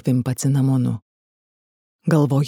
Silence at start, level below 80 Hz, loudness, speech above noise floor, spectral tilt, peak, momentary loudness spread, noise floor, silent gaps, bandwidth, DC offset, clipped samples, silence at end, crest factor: 0.05 s; -58 dBFS; -20 LUFS; over 72 dB; -7.5 dB/octave; -4 dBFS; 10 LU; under -90 dBFS; 1.02-1.99 s; 14.5 kHz; under 0.1%; under 0.1%; 0 s; 16 dB